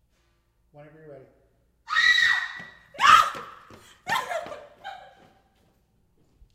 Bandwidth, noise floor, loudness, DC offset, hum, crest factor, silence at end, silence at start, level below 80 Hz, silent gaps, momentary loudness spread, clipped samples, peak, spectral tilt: 16 kHz; -68 dBFS; -21 LUFS; under 0.1%; none; 26 dB; 1.55 s; 0.8 s; -62 dBFS; none; 26 LU; under 0.1%; -2 dBFS; 0 dB/octave